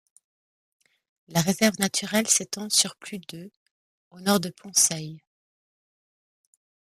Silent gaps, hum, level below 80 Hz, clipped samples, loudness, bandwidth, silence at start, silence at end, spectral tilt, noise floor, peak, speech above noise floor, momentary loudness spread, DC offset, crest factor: 3.57-4.11 s; none; -68 dBFS; under 0.1%; -23 LUFS; 15 kHz; 1.3 s; 1.7 s; -2.5 dB/octave; under -90 dBFS; -4 dBFS; over 65 dB; 18 LU; under 0.1%; 24 dB